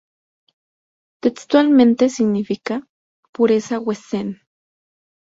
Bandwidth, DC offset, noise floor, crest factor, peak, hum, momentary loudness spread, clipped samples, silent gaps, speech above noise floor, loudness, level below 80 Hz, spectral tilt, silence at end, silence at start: 7.8 kHz; under 0.1%; under -90 dBFS; 18 dB; -2 dBFS; none; 15 LU; under 0.1%; 2.89-3.23 s, 3.29-3.33 s; over 73 dB; -18 LUFS; -64 dBFS; -6 dB/octave; 1.05 s; 1.25 s